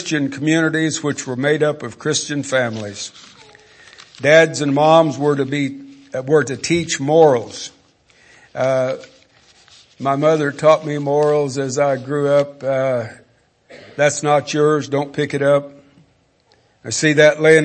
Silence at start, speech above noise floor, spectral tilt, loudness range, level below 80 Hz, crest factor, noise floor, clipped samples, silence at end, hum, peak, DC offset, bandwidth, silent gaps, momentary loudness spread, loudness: 0 s; 41 dB; -4.5 dB/octave; 4 LU; -62 dBFS; 18 dB; -57 dBFS; under 0.1%; 0 s; none; 0 dBFS; under 0.1%; 8.8 kHz; none; 15 LU; -17 LUFS